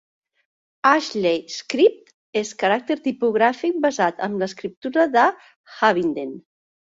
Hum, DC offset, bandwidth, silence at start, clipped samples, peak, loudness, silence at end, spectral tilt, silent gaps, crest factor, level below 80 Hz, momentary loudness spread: none; under 0.1%; 7.8 kHz; 0.85 s; under 0.1%; -2 dBFS; -21 LUFS; 0.55 s; -4.5 dB/octave; 2.14-2.33 s, 4.77-4.82 s, 5.56-5.64 s; 20 dB; -68 dBFS; 10 LU